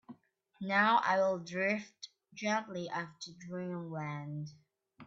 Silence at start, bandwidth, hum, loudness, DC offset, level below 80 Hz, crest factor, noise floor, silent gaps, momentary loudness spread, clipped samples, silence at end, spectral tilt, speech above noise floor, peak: 0.1 s; 7.8 kHz; none; -34 LUFS; under 0.1%; -80 dBFS; 22 dB; -58 dBFS; none; 19 LU; under 0.1%; 0 s; -3.5 dB/octave; 23 dB; -14 dBFS